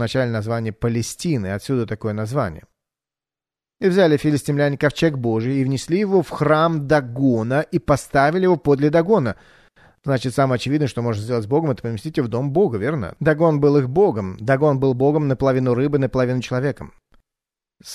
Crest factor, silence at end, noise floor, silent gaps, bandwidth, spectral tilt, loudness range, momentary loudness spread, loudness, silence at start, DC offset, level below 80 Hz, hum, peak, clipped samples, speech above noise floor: 16 dB; 0 s; under -90 dBFS; none; 13.5 kHz; -7 dB/octave; 4 LU; 7 LU; -19 LUFS; 0 s; under 0.1%; -48 dBFS; none; -4 dBFS; under 0.1%; over 71 dB